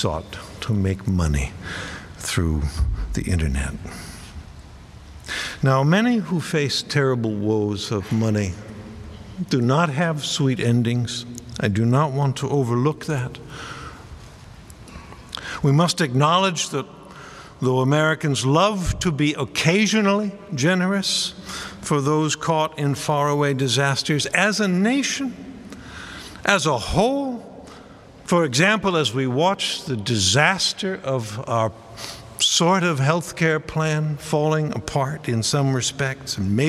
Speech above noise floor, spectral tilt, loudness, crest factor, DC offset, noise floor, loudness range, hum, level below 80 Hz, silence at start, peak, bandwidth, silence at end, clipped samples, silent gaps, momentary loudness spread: 23 dB; -4.5 dB/octave; -21 LUFS; 22 dB; under 0.1%; -44 dBFS; 5 LU; none; -38 dBFS; 0 s; 0 dBFS; 14 kHz; 0 s; under 0.1%; none; 18 LU